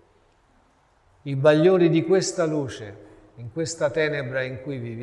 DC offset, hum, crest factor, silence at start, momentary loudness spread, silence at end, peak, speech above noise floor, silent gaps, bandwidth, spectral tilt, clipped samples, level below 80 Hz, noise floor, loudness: under 0.1%; none; 20 dB; 1.25 s; 20 LU; 0 s; -4 dBFS; 39 dB; none; 11 kHz; -5.5 dB/octave; under 0.1%; -60 dBFS; -61 dBFS; -22 LUFS